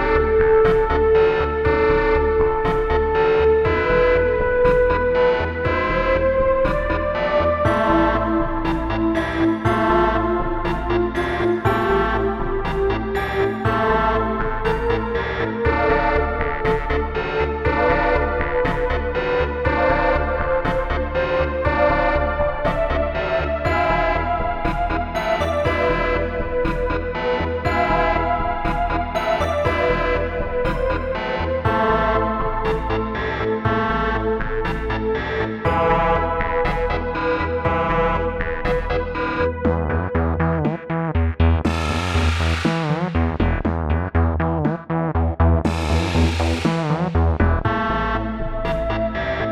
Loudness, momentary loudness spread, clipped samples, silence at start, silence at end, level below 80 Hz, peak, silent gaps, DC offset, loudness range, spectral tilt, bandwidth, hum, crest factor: -20 LUFS; 6 LU; under 0.1%; 0 s; 0 s; -28 dBFS; -4 dBFS; none; under 0.1%; 4 LU; -7 dB/octave; 11.5 kHz; none; 16 dB